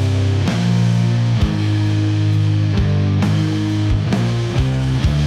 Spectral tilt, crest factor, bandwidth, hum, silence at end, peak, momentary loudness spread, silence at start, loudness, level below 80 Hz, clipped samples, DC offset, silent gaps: -7 dB/octave; 10 dB; 10 kHz; none; 0 s; -6 dBFS; 2 LU; 0 s; -17 LUFS; -28 dBFS; under 0.1%; under 0.1%; none